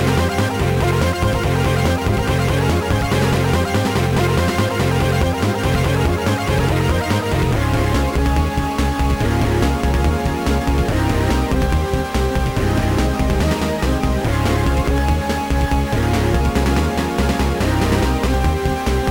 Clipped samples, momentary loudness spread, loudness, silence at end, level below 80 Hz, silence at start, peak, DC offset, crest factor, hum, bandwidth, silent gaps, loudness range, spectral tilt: under 0.1%; 2 LU; -18 LUFS; 0 s; -22 dBFS; 0 s; -4 dBFS; under 0.1%; 12 dB; none; 18.5 kHz; none; 1 LU; -6 dB/octave